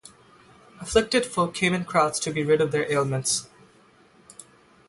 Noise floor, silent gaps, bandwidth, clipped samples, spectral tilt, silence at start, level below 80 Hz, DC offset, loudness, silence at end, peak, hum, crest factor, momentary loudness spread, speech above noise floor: -56 dBFS; none; 11.5 kHz; under 0.1%; -4 dB/octave; 0.75 s; -52 dBFS; under 0.1%; -24 LUFS; 0.45 s; -6 dBFS; none; 20 dB; 4 LU; 33 dB